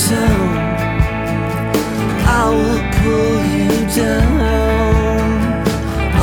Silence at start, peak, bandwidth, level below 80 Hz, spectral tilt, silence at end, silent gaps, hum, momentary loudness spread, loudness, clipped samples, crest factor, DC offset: 0 s; 0 dBFS; over 20 kHz; -22 dBFS; -6 dB/octave; 0 s; none; none; 4 LU; -15 LUFS; under 0.1%; 14 dB; under 0.1%